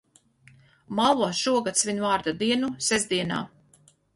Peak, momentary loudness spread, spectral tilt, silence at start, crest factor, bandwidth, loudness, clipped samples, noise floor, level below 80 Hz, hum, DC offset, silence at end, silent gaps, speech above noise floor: -8 dBFS; 8 LU; -3 dB/octave; 0.9 s; 18 dB; 11.5 kHz; -25 LUFS; under 0.1%; -60 dBFS; -62 dBFS; none; under 0.1%; 0.7 s; none; 35 dB